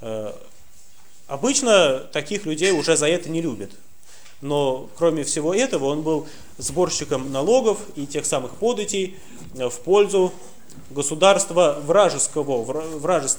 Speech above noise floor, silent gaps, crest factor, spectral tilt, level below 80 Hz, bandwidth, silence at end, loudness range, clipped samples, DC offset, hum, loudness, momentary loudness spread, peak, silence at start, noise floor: 32 dB; none; 20 dB; -3.5 dB/octave; -56 dBFS; over 20 kHz; 0 s; 4 LU; under 0.1%; 1%; none; -21 LUFS; 13 LU; -2 dBFS; 0 s; -53 dBFS